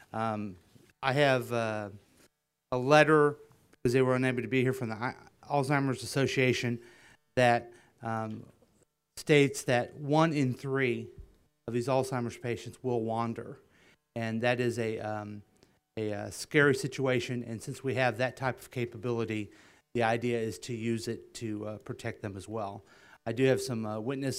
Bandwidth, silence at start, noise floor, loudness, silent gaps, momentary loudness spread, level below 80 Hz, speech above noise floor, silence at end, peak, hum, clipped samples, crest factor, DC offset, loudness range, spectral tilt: 16 kHz; 0.15 s; -71 dBFS; -31 LUFS; none; 15 LU; -64 dBFS; 41 dB; 0 s; -8 dBFS; none; under 0.1%; 24 dB; under 0.1%; 7 LU; -5.5 dB/octave